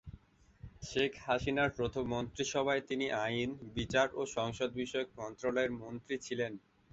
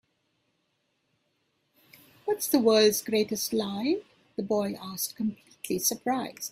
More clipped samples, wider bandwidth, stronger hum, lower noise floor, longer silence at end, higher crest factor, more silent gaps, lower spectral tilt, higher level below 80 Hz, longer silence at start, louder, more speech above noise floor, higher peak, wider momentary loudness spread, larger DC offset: neither; second, 8 kHz vs 16 kHz; neither; second, -59 dBFS vs -75 dBFS; first, 0.35 s vs 0 s; about the same, 20 dB vs 20 dB; neither; about the same, -3.5 dB/octave vs -3.5 dB/octave; first, -58 dBFS vs -70 dBFS; second, 0.05 s vs 2.25 s; second, -36 LUFS vs -27 LUFS; second, 23 dB vs 48 dB; second, -16 dBFS vs -10 dBFS; second, 9 LU vs 12 LU; neither